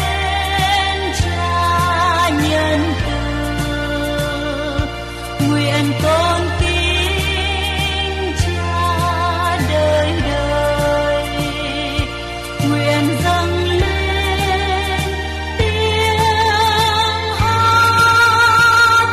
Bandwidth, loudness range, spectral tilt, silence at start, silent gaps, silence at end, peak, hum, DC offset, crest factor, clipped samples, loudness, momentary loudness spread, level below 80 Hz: 14 kHz; 4 LU; -4.5 dB/octave; 0 s; none; 0 s; -4 dBFS; none; under 0.1%; 12 dB; under 0.1%; -16 LUFS; 10 LU; -28 dBFS